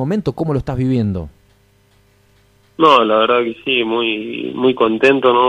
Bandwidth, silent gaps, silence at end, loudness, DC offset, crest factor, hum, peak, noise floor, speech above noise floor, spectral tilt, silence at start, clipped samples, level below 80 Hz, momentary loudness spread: 9.6 kHz; none; 0 s; -15 LUFS; under 0.1%; 16 dB; 50 Hz at -50 dBFS; 0 dBFS; -54 dBFS; 39 dB; -7 dB/octave; 0 s; under 0.1%; -42 dBFS; 10 LU